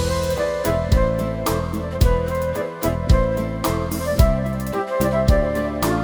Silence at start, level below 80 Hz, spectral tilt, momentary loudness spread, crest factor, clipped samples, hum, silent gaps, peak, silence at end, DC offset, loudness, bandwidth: 0 s; -24 dBFS; -6 dB/octave; 5 LU; 18 dB; under 0.1%; none; none; -2 dBFS; 0 s; under 0.1%; -21 LUFS; over 20 kHz